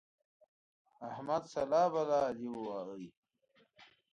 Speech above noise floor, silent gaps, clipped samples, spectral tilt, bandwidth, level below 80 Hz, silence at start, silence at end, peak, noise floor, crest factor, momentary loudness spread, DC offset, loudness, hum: 30 dB; 3.17-3.23 s; under 0.1%; -6 dB/octave; 9.2 kHz; -76 dBFS; 1 s; 0.3 s; -20 dBFS; -65 dBFS; 18 dB; 18 LU; under 0.1%; -35 LUFS; none